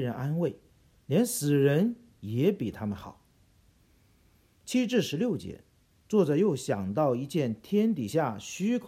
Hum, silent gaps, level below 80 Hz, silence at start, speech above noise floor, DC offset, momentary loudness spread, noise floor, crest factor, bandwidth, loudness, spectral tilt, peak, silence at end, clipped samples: none; none; -64 dBFS; 0 s; 36 dB; under 0.1%; 11 LU; -64 dBFS; 16 dB; 16 kHz; -28 LUFS; -6 dB/octave; -12 dBFS; 0 s; under 0.1%